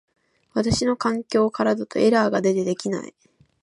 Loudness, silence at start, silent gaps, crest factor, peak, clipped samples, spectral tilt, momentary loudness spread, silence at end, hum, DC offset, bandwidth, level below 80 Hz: -22 LUFS; 0.55 s; none; 16 dB; -6 dBFS; under 0.1%; -5.5 dB/octave; 10 LU; 0.55 s; none; under 0.1%; 11 kHz; -48 dBFS